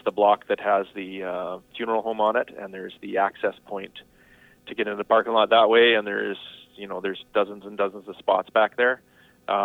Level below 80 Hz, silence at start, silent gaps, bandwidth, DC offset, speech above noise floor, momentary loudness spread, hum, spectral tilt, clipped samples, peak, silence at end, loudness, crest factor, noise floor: -68 dBFS; 0.05 s; none; 4.3 kHz; under 0.1%; 31 dB; 18 LU; none; -5.5 dB/octave; under 0.1%; -6 dBFS; 0 s; -23 LUFS; 18 dB; -55 dBFS